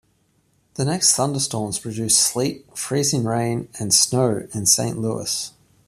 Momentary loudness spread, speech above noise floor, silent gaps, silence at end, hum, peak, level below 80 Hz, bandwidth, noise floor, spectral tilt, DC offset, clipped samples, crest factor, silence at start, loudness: 10 LU; 42 dB; none; 0.4 s; none; -2 dBFS; -58 dBFS; 15 kHz; -64 dBFS; -3 dB/octave; under 0.1%; under 0.1%; 20 dB; 0.75 s; -20 LUFS